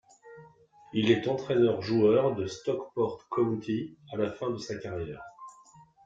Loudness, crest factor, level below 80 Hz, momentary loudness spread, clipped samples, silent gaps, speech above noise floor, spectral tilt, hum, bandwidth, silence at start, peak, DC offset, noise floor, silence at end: -29 LUFS; 20 dB; -64 dBFS; 14 LU; under 0.1%; none; 28 dB; -6.5 dB/octave; none; 7.8 kHz; 0.25 s; -10 dBFS; under 0.1%; -57 dBFS; 0.25 s